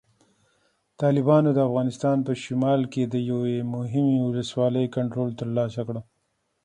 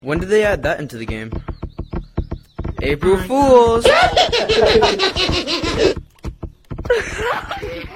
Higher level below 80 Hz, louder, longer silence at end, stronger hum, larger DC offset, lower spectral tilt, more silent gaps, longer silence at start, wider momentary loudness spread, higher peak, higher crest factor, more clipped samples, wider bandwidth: second, -64 dBFS vs -32 dBFS; second, -24 LUFS vs -16 LUFS; first, 0.65 s vs 0 s; neither; neither; first, -8 dB/octave vs -4.5 dB/octave; neither; first, 1 s vs 0.05 s; second, 9 LU vs 19 LU; second, -6 dBFS vs 0 dBFS; about the same, 18 dB vs 16 dB; neither; second, 10 kHz vs 15.5 kHz